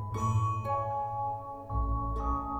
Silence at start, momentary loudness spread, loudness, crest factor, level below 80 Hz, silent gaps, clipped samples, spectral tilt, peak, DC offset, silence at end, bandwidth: 0 s; 6 LU; -33 LUFS; 12 dB; -38 dBFS; none; under 0.1%; -8 dB/octave; -20 dBFS; under 0.1%; 0 s; 8.2 kHz